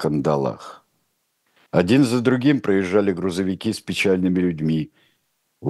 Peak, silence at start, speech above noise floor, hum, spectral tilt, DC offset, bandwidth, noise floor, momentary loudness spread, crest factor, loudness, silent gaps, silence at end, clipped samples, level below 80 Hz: -2 dBFS; 0 s; 50 dB; none; -6.5 dB/octave; under 0.1%; 12.5 kHz; -70 dBFS; 9 LU; 18 dB; -20 LUFS; none; 0 s; under 0.1%; -56 dBFS